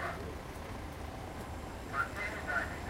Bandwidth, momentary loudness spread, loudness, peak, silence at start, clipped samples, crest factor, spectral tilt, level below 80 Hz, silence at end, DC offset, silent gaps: 16 kHz; 8 LU; -40 LUFS; -22 dBFS; 0 s; under 0.1%; 18 dB; -5 dB/octave; -48 dBFS; 0 s; under 0.1%; none